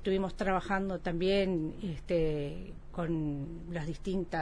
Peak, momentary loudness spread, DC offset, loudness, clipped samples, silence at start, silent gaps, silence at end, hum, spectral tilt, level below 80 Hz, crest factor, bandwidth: -18 dBFS; 10 LU; under 0.1%; -34 LUFS; under 0.1%; 0 s; none; 0 s; none; -7 dB/octave; -44 dBFS; 16 dB; 10.5 kHz